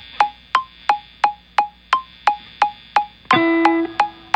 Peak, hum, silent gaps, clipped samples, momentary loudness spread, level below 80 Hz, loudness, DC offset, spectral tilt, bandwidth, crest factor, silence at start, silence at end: 0 dBFS; none; none; under 0.1%; 6 LU; -56 dBFS; -20 LUFS; under 0.1%; -4.5 dB/octave; 9.4 kHz; 20 dB; 0.15 s; 0.25 s